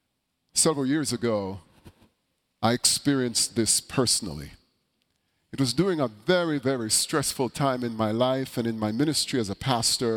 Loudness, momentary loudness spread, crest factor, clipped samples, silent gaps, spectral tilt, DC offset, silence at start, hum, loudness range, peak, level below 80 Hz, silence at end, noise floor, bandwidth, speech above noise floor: -25 LUFS; 6 LU; 22 dB; under 0.1%; none; -3.5 dB/octave; under 0.1%; 0.55 s; none; 1 LU; -6 dBFS; -56 dBFS; 0 s; -77 dBFS; 17.5 kHz; 51 dB